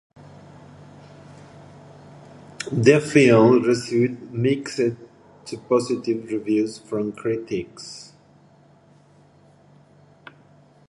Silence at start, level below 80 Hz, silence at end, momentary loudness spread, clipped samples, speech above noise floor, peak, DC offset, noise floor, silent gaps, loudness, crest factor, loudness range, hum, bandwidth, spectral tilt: 1.3 s; -62 dBFS; 2.85 s; 22 LU; under 0.1%; 33 dB; -2 dBFS; under 0.1%; -54 dBFS; none; -20 LUFS; 22 dB; 13 LU; none; 11.5 kHz; -6 dB/octave